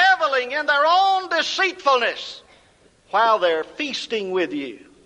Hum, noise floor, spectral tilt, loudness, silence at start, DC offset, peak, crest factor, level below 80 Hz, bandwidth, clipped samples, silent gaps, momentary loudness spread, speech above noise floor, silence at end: none; -56 dBFS; -2 dB/octave; -20 LUFS; 0 s; under 0.1%; -6 dBFS; 16 dB; -66 dBFS; 10 kHz; under 0.1%; none; 13 LU; 35 dB; 0.3 s